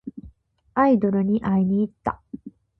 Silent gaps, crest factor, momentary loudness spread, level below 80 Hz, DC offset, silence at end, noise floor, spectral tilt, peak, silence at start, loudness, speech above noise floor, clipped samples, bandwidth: none; 16 dB; 21 LU; -52 dBFS; under 0.1%; 0.3 s; -53 dBFS; -11 dB/octave; -8 dBFS; 0.05 s; -22 LUFS; 32 dB; under 0.1%; 4.4 kHz